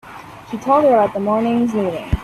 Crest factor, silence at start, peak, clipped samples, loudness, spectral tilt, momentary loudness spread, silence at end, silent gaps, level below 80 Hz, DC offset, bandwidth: 14 dB; 0.05 s; -2 dBFS; under 0.1%; -17 LUFS; -7.5 dB/octave; 19 LU; 0 s; none; -34 dBFS; under 0.1%; 13.5 kHz